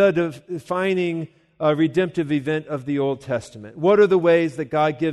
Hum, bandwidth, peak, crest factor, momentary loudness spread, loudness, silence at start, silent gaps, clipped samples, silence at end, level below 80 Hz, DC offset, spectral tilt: none; 12 kHz; -4 dBFS; 16 dB; 12 LU; -21 LUFS; 0 s; none; under 0.1%; 0 s; -62 dBFS; under 0.1%; -7 dB/octave